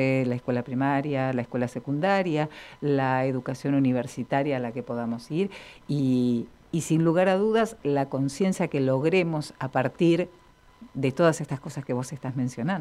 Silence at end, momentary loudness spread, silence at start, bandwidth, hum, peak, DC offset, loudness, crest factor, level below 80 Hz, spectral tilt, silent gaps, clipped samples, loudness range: 0 s; 9 LU; 0 s; 13.5 kHz; none; -8 dBFS; under 0.1%; -26 LUFS; 18 dB; -60 dBFS; -7 dB/octave; none; under 0.1%; 3 LU